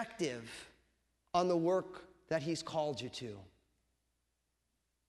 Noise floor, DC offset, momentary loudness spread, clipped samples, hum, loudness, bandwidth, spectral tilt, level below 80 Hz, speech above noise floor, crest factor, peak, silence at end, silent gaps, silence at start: -83 dBFS; under 0.1%; 18 LU; under 0.1%; none; -37 LUFS; 12 kHz; -5 dB/octave; -72 dBFS; 46 dB; 22 dB; -18 dBFS; 1.65 s; none; 0 s